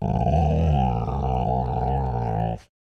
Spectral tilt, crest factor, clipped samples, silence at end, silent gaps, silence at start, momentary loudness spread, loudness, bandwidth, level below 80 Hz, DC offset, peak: -9.5 dB/octave; 14 dB; under 0.1%; 0.25 s; none; 0 s; 5 LU; -24 LUFS; 6.6 kHz; -30 dBFS; 0.2%; -10 dBFS